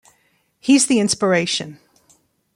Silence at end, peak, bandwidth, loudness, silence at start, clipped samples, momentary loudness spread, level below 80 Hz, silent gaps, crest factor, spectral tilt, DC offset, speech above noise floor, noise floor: 0.8 s; -4 dBFS; 15.5 kHz; -17 LUFS; 0.65 s; under 0.1%; 12 LU; -62 dBFS; none; 16 dB; -3.5 dB/octave; under 0.1%; 46 dB; -63 dBFS